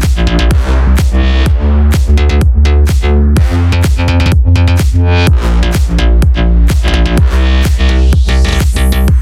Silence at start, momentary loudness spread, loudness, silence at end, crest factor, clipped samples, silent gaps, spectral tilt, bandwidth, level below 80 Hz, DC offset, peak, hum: 0 s; 2 LU; -10 LUFS; 0 s; 8 dB; under 0.1%; none; -6 dB/octave; 13.5 kHz; -8 dBFS; under 0.1%; 0 dBFS; none